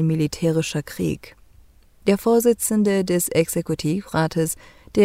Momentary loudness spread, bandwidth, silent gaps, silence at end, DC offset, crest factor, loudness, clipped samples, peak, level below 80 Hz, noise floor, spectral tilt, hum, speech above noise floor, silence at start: 9 LU; 16 kHz; none; 0 s; under 0.1%; 16 dB; -21 LUFS; under 0.1%; -4 dBFS; -50 dBFS; -51 dBFS; -5.5 dB/octave; none; 30 dB; 0 s